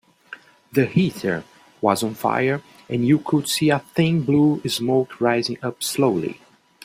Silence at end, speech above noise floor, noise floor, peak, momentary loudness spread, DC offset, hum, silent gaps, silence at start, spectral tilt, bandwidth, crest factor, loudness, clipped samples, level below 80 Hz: 0.5 s; 24 dB; -44 dBFS; -2 dBFS; 10 LU; under 0.1%; none; none; 0.3 s; -5.5 dB/octave; 16 kHz; 20 dB; -21 LUFS; under 0.1%; -60 dBFS